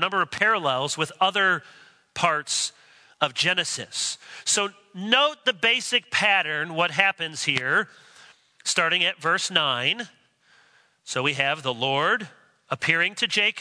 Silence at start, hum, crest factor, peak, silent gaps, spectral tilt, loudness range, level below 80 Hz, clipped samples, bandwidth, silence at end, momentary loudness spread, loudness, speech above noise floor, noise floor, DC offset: 0 s; none; 22 dB; -4 dBFS; none; -1.5 dB/octave; 3 LU; -72 dBFS; under 0.1%; 11 kHz; 0 s; 9 LU; -23 LUFS; 35 dB; -60 dBFS; under 0.1%